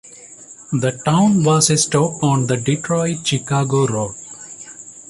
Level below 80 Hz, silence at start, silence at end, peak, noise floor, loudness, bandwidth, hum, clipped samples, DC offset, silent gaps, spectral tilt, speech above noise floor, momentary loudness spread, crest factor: -54 dBFS; 0.05 s; 0.1 s; -2 dBFS; -40 dBFS; -17 LUFS; 11.5 kHz; none; under 0.1%; under 0.1%; none; -5 dB/octave; 24 dB; 20 LU; 16 dB